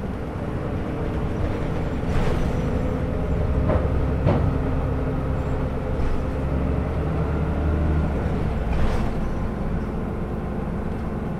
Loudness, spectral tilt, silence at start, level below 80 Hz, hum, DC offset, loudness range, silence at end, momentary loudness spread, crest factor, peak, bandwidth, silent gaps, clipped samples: -25 LUFS; -8.5 dB/octave; 0 s; -26 dBFS; none; under 0.1%; 2 LU; 0 s; 6 LU; 16 dB; -8 dBFS; 10.5 kHz; none; under 0.1%